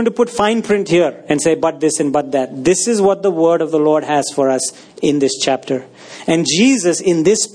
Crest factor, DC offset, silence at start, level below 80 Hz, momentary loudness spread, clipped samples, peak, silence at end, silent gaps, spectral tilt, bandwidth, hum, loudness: 14 dB; under 0.1%; 0 s; -56 dBFS; 7 LU; under 0.1%; 0 dBFS; 0.05 s; none; -4 dB/octave; 10.5 kHz; none; -15 LUFS